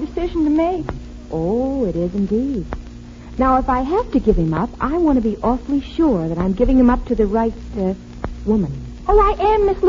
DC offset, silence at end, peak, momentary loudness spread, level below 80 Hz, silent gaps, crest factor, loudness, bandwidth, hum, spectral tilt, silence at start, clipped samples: under 0.1%; 0 s; -2 dBFS; 12 LU; -28 dBFS; none; 16 dB; -18 LUFS; 7.6 kHz; none; -8.5 dB/octave; 0 s; under 0.1%